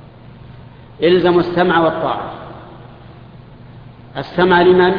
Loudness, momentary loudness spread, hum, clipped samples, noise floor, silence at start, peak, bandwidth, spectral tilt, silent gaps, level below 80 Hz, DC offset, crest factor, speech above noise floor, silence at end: -14 LUFS; 21 LU; none; under 0.1%; -38 dBFS; 0.45 s; 0 dBFS; 5.2 kHz; -9 dB/octave; none; -46 dBFS; under 0.1%; 16 dB; 25 dB; 0 s